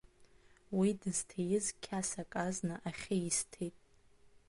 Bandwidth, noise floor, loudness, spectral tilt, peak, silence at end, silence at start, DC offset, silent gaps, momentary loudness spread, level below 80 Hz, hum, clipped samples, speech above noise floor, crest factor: 11.5 kHz; -64 dBFS; -37 LUFS; -4.5 dB/octave; -22 dBFS; 0.8 s; 0.2 s; under 0.1%; none; 8 LU; -66 dBFS; none; under 0.1%; 27 dB; 18 dB